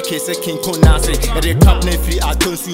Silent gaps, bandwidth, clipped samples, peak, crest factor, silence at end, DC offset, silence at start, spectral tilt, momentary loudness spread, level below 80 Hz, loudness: none; 16.5 kHz; under 0.1%; 0 dBFS; 14 dB; 0 s; under 0.1%; 0 s; -5 dB/octave; 8 LU; -16 dBFS; -15 LUFS